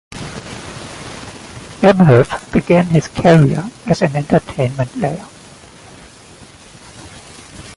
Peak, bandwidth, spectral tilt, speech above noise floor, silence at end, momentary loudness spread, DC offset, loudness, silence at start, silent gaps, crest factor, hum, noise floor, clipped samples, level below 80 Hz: 0 dBFS; 11.5 kHz; -7 dB/octave; 27 dB; 0.05 s; 25 LU; under 0.1%; -14 LUFS; 0.1 s; none; 16 dB; none; -40 dBFS; under 0.1%; -42 dBFS